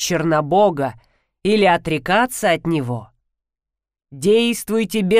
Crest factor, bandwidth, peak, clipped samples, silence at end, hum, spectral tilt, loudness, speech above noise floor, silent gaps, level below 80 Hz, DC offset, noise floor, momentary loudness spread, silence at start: 14 dB; 16 kHz; -4 dBFS; under 0.1%; 0 s; none; -5 dB/octave; -18 LUFS; 69 dB; none; -50 dBFS; 0.2%; -86 dBFS; 10 LU; 0 s